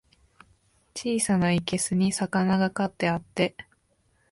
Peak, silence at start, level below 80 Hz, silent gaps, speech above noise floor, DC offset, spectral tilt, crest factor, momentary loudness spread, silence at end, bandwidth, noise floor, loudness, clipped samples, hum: -10 dBFS; 0.95 s; -58 dBFS; none; 43 dB; under 0.1%; -5 dB/octave; 18 dB; 6 LU; 0.7 s; 11.5 kHz; -68 dBFS; -26 LUFS; under 0.1%; none